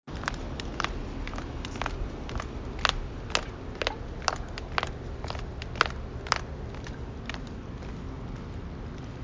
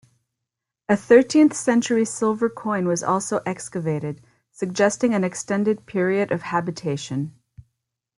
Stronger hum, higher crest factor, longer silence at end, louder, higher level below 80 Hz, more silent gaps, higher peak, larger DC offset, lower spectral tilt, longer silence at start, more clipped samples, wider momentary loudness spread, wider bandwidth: neither; first, 30 dB vs 20 dB; second, 0 s vs 0.9 s; second, -34 LUFS vs -22 LUFS; first, -40 dBFS vs -64 dBFS; neither; about the same, -4 dBFS vs -2 dBFS; neither; second, -4 dB/octave vs -5.5 dB/octave; second, 0.05 s vs 0.9 s; neither; about the same, 11 LU vs 12 LU; second, 7.8 kHz vs 11.5 kHz